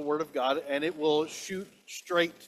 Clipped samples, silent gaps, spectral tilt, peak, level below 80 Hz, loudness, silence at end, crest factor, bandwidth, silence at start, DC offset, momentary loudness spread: under 0.1%; none; -3.5 dB/octave; -12 dBFS; -76 dBFS; -30 LUFS; 0 s; 18 dB; 14.5 kHz; 0 s; under 0.1%; 12 LU